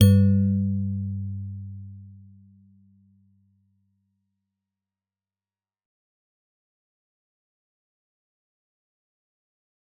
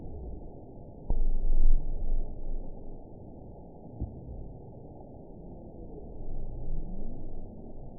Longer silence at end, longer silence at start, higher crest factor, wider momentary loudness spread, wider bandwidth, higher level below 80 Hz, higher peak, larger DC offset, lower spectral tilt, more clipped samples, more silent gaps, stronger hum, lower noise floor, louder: first, 7.85 s vs 0 s; about the same, 0 s vs 0 s; first, 24 dB vs 18 dB; first, 23 LU vs 15 LU; first, 4.5 kHz vs 1 kHz; second, -62 dBFS vs -30 dBFS; first, -4 dBFS vs -10 dBFS; second, under 0.1% vs 0.2%; second, -9.5 dB/octave vs -16 dB/octave; neither; neither; neither; first, under -90 dBFS vs -47 dBFS; first, -24 LUFS vs -40 LUFS